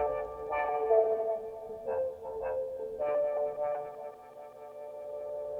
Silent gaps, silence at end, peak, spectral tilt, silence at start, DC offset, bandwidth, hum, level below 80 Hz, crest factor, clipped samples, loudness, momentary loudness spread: none; 0 s; -14 dBFS; -6.5 dB/octave; 0 s; under 0.1%; 5.8 kHz; none; -64 dBFS; 20 dB; under 0.1%; -33 LUFS; 19 LU